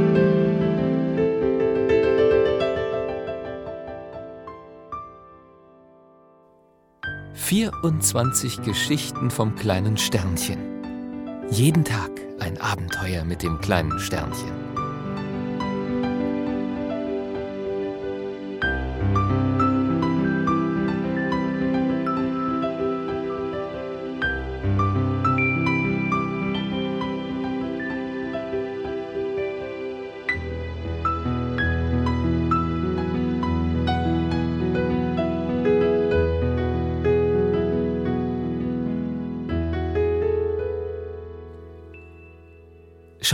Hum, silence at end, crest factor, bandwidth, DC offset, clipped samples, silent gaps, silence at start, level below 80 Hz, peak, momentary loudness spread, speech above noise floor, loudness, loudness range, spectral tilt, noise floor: none; 0 s; 22 dB; 16 kHz; under 0.1%; under 0.1%; none; 0 s; -40 dBFS; -2 dBFS; 12 LU; 35 dB; -24 LUFS; 6 LU; -5.5 dB/octave; -58 dBFS